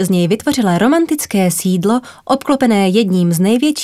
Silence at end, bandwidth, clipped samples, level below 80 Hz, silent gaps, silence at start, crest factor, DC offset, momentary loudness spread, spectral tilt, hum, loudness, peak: 0 s; 16 kHz; under 0.1%; -54 dBFS; none; 0 s; 14 dB; under 0.1%; 4 LU; -5.5 dB/octave; none; -14 LUFS; 0 dBFS